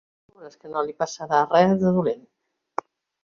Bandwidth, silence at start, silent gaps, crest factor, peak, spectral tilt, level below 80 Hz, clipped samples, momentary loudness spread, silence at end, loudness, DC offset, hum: 7.4 kHz; 0.4 s; none; 20 dB; -4 dBFS; -6.5 dB/octave; -62 dBFS; under 0.1%; 17 LU; 1.05 s; -22 LUFS; under 0.1%; none